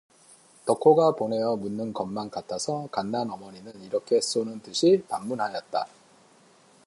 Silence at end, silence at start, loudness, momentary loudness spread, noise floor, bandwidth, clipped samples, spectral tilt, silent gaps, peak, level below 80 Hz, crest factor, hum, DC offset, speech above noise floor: 1 s; 0.65 s; -26 LUFS; 13 LU; -57 dBFS; 11.5 kHz; under 0.1%; -5 dB/octave; none; -6 dBFS; -70 dBFS; 22 dB; none; under 0.1%; 32 dB